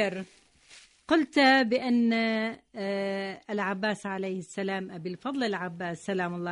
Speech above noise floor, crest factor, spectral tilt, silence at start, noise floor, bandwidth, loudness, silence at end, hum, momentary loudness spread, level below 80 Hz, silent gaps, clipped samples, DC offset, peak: 27 dB; 18 dB; -5 dB/octave; 0 s; -56 dBFS; 10.5 kHz; -28 LUFS; 0 s; none; 14 LU; -70 dBFS; none; under 0.1%; under 0.1%; -10 dBFS